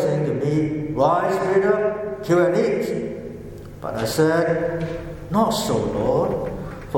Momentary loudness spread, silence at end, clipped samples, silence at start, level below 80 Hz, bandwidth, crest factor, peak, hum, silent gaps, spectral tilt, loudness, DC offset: 13 LU; 0 s; under 0.1%; 0 s; -44 dBFS; 17.5 kHz; 16 dB; -6 dBFS; none; none; -6 dB/octave; -21 LUFS; under 0.1%